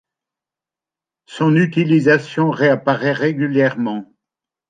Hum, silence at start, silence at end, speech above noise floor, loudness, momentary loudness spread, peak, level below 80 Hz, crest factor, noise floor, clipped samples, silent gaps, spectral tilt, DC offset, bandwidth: none; 1.3 s; 0.65 s; 73 dB; -16 LUFS; 9 LU; -2 dBFS; -64 dBFS; 16 dB; -88 dBFS; under 0.1%; none; -7.5 dB/octave; under 0.1%; 9.2 kHz